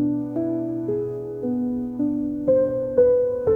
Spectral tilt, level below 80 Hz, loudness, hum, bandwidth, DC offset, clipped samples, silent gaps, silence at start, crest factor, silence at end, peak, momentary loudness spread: -11.5 dB/octave; -52 dBFS; -23 LUFS; none; 2.2 kHz; under 0.1%; under 0.1%; none; 0 s; 16 dB; 0 s; -6 dBFS; 8 LU